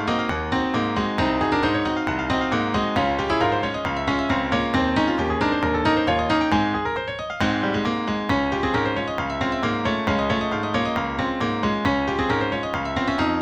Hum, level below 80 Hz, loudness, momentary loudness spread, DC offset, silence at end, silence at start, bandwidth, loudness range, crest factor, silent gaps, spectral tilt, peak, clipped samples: none; -40 dBFS; -22 LUFS; 4 LU; under 0.1%; 0 s; 0 s; 9.6 kHz; 2 LU; 16 dB; none; -6 dB/octave; -6 dBFS; under 0.1%